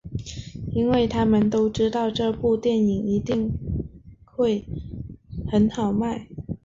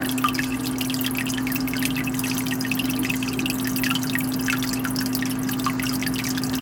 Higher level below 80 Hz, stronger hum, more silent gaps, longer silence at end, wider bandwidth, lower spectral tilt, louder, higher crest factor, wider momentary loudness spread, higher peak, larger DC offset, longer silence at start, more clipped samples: about the same, -42 dBFS vs -46 dBFS; neither; neither; about the same, 0.1 s vs 0 s; second, 7.6 kHz vs 19 kHz; first, -7.5 dB/octave vs -3.5 dB/octave; about the same, -23 LUFS vs -24 LUFS; second, 14 dB vs 20 dB; first, 15 LU vs 2 LU; second, -10 dBFS vs -4 dBFS; neither; about the same, 0.05 s vs 0 s; neither